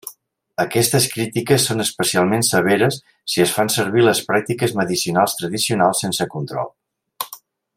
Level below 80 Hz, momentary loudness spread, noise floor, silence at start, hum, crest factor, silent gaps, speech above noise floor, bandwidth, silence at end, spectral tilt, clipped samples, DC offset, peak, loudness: -60 dBFS; 13 LU; -43 dBFS; 0.05 s; none; 18 dB; none; 25 dB; 16.5 kHz; 0.4 s; -4 dB/octave; under 0.1%; under 0.1%; -2 dBFS; -18 LUFS